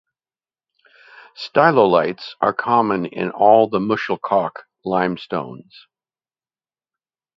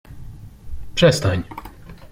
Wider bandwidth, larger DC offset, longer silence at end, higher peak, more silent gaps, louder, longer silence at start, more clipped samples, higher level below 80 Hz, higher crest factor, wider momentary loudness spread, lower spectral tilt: second, 7.4 kHz vs 16 kHz; neither; first, 1.8 s vs 0.05 s; about the same, 0 dBFS vs -2 dBFS; neither; about the same, -18 LUFS vs -19 LUFS; first, 1.4 s vs 0.1 s; neither; second, -62 dBFS vs -38 dBFS; about the same, 20 dB vs 20 dB; second, 13 LU vs 25 LU; first, -7.5 dB/octave vs -5 dB/octave